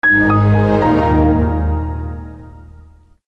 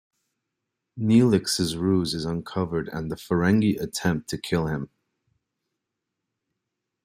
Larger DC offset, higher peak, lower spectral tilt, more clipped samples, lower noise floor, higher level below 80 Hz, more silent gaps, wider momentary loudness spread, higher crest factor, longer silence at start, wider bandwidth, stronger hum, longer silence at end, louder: neither; about the same, -4 dBFS vs -6 dBFS; first, -9.5 dB/octave vs -5.5 dB/octave; neither; second, -43 dBFS vs -83 dBFS; first, -26 dBFS vs -54 dBFS; neither; first, 16 LU vs 10 LU; second, 12 dB vs 20 dB; second, 0.05 s vs 0.95 s; second, 6 kHz vs 15.5 kHz; neither; second, 0.6 s vs 2.2 s; first, -14 LUFS vs -24 LUFS